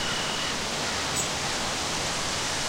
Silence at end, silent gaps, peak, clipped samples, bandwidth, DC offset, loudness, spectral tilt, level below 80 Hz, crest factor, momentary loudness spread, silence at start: 0 s; none; -14 dBFS; under 0.1%; 16 kHz; under 0.1%; -27 LUFS; -1.5 dB/octave; -48 dBFS; 16 dB; 1 LU; 0 s